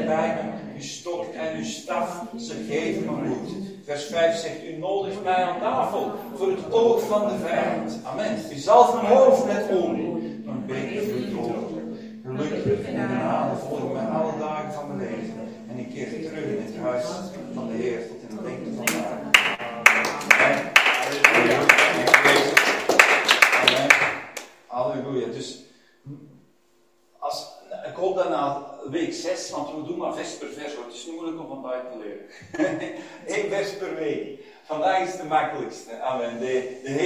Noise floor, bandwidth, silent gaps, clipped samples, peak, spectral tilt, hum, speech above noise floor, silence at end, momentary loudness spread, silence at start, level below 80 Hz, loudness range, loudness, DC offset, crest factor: -63 dBFS; 16 kHz; none; under 0.1%; 0 dBFS; -3.5 dB/octave; none; 38 dB; 0 s; 18 LU; 0 s; -64 dBFS; 15 LU; -22 LUFS; under 0.1%; 24 dB